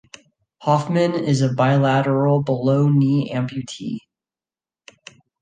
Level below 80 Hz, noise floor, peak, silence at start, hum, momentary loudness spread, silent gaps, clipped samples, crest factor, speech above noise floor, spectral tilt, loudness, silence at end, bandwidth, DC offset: -62 dBFS; under -90 dBFS; -2 dBFS; 0.6 s; none; 12 LU; none; under 0.1%; 18 dB; over 72 dB; -7.5 dB/octave; -19 LUFS; 1.45 s; 9.2 kHz; under 0.1%